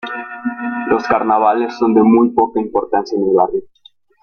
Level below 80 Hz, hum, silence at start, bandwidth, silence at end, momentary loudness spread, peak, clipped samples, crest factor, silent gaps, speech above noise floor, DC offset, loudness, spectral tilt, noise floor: -54 dBFS; none; 0.05 s; 6.8 kHz; 0.55 s; 12 LU; -2 dBFS; under 0.1%; 14 dB; none; 36 dB; under 0.1%; -15 LUFS; -7.5 dB/octave; -50 dBFS